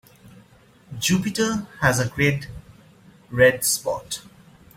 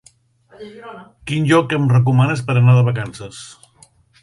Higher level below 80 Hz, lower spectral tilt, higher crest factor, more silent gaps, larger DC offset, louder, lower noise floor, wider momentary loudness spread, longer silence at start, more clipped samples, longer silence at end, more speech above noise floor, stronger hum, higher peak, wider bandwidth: about the same, -50 dBFS vs -52 dBFS; second, -4 dB/octave vs -7 dB/octave; first, 22 dB vs 16 dB; neither; neither; second, -22 LUFS vs -15 LUFS; about the same, -53 dBFS vs -53 dBFS; second, 16 LU vs 23 LU; first, 0.9 s vs 0.6 s; neither; second, 0.55 s vs 0.75 s; second, 31 dB vs 37 dB; neither; about the same, -2 dBFS vs -2 dBFS; first, 16.5 kHz vs 11.5 kHz